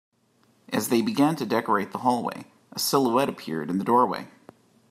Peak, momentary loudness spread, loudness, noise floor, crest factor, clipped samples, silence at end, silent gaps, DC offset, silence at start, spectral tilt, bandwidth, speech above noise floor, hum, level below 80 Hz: -8 dBFS; 12 LU; -25 LUFS; -64 dBFS; 18 dB; under 0.1%; 0.65 s; none; under 0.1%; 0.7 s; -4.5 dB/octave; 16 kHz; 40 dB; none; -72 dBFS